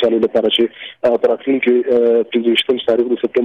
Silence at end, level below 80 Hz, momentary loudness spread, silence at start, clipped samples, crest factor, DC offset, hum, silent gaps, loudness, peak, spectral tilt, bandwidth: 0 s; -60 dBFS; 3 LU; 0 s; under 0.1%; 10 dB; under 0.1%; none; none; -15 LUFS; -4 dBFS; -5.5 dB/octave; 10.5 kHz